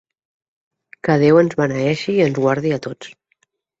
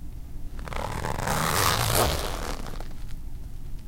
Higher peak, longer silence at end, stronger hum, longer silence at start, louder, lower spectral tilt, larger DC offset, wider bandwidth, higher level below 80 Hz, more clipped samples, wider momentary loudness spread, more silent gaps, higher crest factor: about the same, -2 dBFS vs -4 dBFS; first, 0.7 s vs 0 s; neither; first, 1.05 s vs 0 s; first, -17 LUFS vs -26 LUFS; first, -7 dB/octave vs -3.5 dB/octave; neither; second, 8 kHz vs 17 kHz; second, -56 dBFS vs -34 dBFS; neither; second, 17 LU vs 20 LU; neither; second, 16 dB vs 24 dB